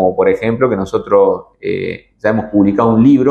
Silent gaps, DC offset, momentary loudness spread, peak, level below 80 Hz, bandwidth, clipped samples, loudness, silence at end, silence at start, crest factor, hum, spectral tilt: none; under 0.1%; 11 LU; 0 dBFS; -46 dBFS; 8 kHz; under 0.1%; -13 LUFS; 0 s; 0 s; 12 dB; none; -8.5 dB/octave